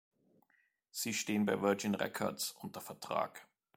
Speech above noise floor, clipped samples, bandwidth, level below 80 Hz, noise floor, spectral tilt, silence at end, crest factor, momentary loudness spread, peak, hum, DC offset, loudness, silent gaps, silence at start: 39 dB; under 0.1%; 16.5 kHz; -80 dBFS; -76 dBFS; -4 dB/octave; 0.35 s; 22 dB; 14 LU; -16 dBFS; none; under 0.1%; -37 LUFS; none; 0.95 s